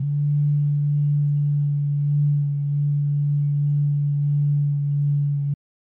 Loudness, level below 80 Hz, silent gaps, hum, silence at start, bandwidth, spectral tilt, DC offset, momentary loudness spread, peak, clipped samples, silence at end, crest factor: -22 LUFS; -68 dBFS; none; none; 0 s; 0.8 kHz; -14 dB/octave; under 0.1%; 2 LU; -16 dBFS; under 0.1%; 0.4 s; 6 dB